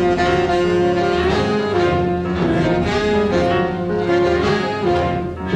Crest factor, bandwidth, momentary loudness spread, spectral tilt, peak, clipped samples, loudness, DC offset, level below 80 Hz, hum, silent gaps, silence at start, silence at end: 12 dB; 9 kHz; 3 LU; -6.5 dB/octave; -4 dBFS; under 0.1%; -17 LUFS; under 0.1%; -34 dBFS; none; none; 0 s; 0 s